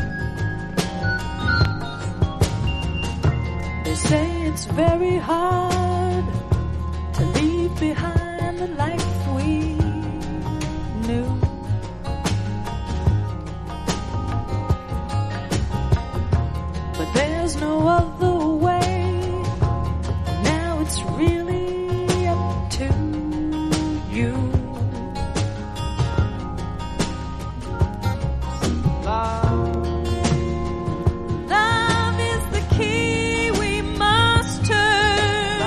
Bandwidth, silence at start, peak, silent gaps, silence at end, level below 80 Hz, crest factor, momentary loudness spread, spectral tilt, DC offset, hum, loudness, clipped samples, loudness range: 13 kHz; 0 s; -4 dBFS; none; 0 s; -30 dBFS; 16 dB; 8 LU; -5.5 dB/octave; under 0.1%; none; -22 LUFS; under 0.1%; 5 LU